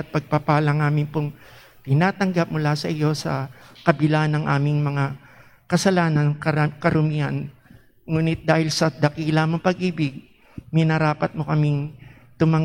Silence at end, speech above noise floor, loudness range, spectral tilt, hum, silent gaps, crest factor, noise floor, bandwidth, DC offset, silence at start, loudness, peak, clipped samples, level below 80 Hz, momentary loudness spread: 0 s; 30 dB; 1 LU; -6.5 dB/octave; none; none; 20 dB; -51 dBFS; 11.5 kHz; under 0.1%; 0 s; -22 LUFS; -2 dBFS; under 0.1%; -54 dBFS; 8 LU